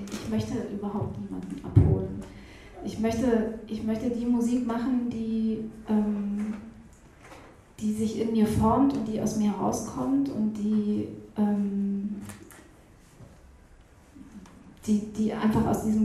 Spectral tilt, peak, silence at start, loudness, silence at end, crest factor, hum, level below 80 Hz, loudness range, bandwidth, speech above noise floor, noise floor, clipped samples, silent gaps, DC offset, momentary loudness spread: -7.5 dB/octave; -6 dBFS; 0 s; -28 LUFS; 0 s; 22 dB; none; -46 dBFS; 7 LU; 13.5 kHz; 27 dB; -54 dBFS; under 0.1%; none; under 0.1%; 16 LU